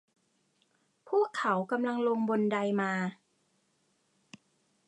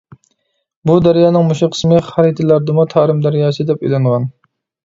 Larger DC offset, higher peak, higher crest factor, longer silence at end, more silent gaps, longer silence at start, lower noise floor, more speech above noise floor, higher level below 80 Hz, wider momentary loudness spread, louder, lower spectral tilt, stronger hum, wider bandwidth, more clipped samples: neither; second, -16 dBFS vs 0 dBFS; about the same, 18 dB vs 14 dB; first, 1.75 s vs 0.55 s; neither; first, 1.05 s vs 0.85 s; first, -74 dBFS vs -67 dBFS; second, 44 dB vs 55 dB; second, -86 dBFS vs -48 dBFS; second, 3 LU vs 6 LU; second, -30 LUFS vs -13 LUFS; second, -6.5 dB/octave vs -8 dB/octave; neither; first, 10.5 kHz vs 7.8 kHz; neither